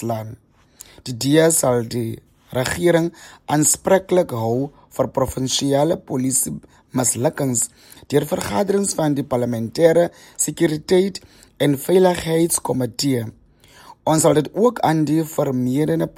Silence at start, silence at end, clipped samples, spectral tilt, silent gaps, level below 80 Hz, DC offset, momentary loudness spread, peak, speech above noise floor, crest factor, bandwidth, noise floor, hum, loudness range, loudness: 0 s; 0.05 s; under 0.1%; -4.5 dB/octave; none; -50 dBFS; under 0.1%; 11 LU; -2 dBFS; 29 dB; 18 dB; 17 kHz; -48 dBFS; none; 2 LU; -19 LUFS